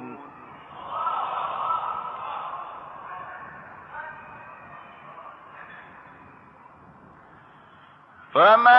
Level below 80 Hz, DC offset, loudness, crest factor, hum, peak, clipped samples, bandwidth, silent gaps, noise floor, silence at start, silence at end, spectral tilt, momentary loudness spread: -70 dBFS; under 0.1%; -26 LUFS; 24 dB; none; -4 dBFS; under 0.1%; 5.8 kHz; none; -51 dBFS; 0 s; 0 s; -6 dB/octave; 17 LU